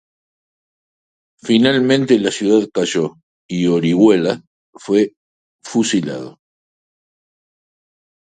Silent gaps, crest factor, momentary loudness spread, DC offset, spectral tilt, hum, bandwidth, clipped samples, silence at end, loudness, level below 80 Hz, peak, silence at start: 3.23-3.49 s, 4.47-4.73 s, 5.17-5.59 s; 18 dB; 14 LU; under 0.1%; -5 dB/octave; none; 9.4 kHz; under 0.1%; 1.95 s; -16 LUFS; -60 dBFS; 0 dBFS; 1.45 s